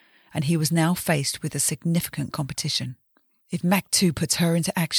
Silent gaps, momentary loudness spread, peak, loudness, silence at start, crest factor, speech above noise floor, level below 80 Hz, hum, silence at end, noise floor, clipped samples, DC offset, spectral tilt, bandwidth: none; 8 LU; -8 dBFS; -24 LUFS; 0.35 s; 16 dB; 41 dB; -56 dBFS; none; 0 s; -65 dBFS; under 0.1%; under 0.1%; -4 dB/octave; over 20 kHz